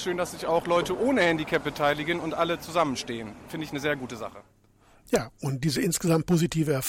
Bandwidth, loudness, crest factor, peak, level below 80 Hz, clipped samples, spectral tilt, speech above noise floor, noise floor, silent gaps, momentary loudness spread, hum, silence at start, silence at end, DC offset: 17 kHz; -27 LUFS; 18 dB; -10 dBFS; -54 dBFS; under 0.1%; -5 dB/octave; 32 dB; -59 dBFS; none; 12 LU; none; 0 s; 0 s; under 0.1%